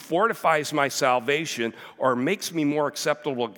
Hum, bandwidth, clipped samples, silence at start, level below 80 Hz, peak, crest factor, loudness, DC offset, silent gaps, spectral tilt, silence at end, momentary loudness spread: none; 18 kHz; under 0.1%; 0 s; -84 dBFS; -6 dBFS; 18 dB; -24 LUFS; under 0.1%; none; -4 dB/octave; 0.05 s; 5 LU